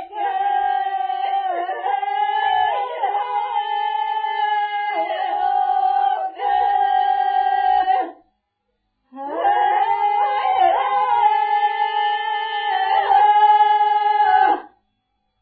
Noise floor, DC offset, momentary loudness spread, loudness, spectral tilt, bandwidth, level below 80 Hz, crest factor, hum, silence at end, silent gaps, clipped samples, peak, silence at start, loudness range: -73 dBFS; under 0.1%; 7 LU; -19 LUFS; -6 dB/octave; 4.8 kHz; -64 dBFS; 14 dB; none; 0.75 s; none; under 0.1%; -4 dBFS; 0 s; 4 LU